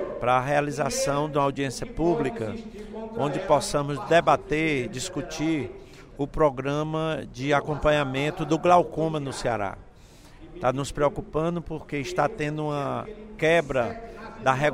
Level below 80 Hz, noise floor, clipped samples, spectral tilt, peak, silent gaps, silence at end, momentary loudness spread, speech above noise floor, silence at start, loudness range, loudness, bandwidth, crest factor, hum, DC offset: -44 dBFS; -49 dBFS; under 0.1%; -5.5 dB/octave; -6 dBFS; none; 0 s; 12 LU; 24 dB; 0 s; 4 LU; -26 LUFS; 16 kHz; 20 dB; none; under 0.1%